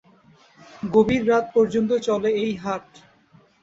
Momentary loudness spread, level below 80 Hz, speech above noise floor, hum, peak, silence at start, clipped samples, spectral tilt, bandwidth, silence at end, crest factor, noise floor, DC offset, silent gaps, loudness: 11 LU; -54 dBFS; 35 dB; none; -4 dBFS; 0.8 s; under 0.1%; -6.5 dB/octave; 7.8 kHz; 0.8 s; 18 dB; -56 dBFS; under 0.1%; none; -21 LUFS